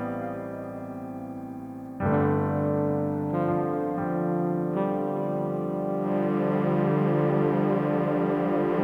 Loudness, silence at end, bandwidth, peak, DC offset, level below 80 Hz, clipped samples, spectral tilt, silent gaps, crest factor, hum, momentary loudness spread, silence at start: -27 LUFS; 0 s; 5 kHz; -10 dBFS; under 0.1%; -58 dBFS; under 0.1%; -10 dB/octave; none; 16 dB; none; 13 LU; 0 s